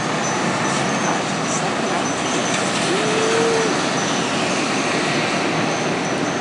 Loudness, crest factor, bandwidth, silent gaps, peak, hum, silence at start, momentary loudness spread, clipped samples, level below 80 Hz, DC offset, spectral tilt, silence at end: -19 LUFS; 14 dB; 11.5 kHz; none; -4 dBFS; none; 0 s; 3 LU; under 0.1%; -56 dBFS; under 0.1%; -3.5 dB/octave; 0 s